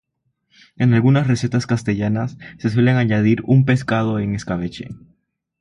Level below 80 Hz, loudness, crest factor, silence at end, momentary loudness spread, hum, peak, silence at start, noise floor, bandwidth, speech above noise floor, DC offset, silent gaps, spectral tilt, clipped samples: -48 dBFS; -18 LUFS; 16 dB; 0.65 s; 10 LU; none; -4 dBFS; 0.8 s; -69 dBFS; 10.5 kHz; 52 dB; under 0.1%; none; -7.5 dB/octave; under 0.1%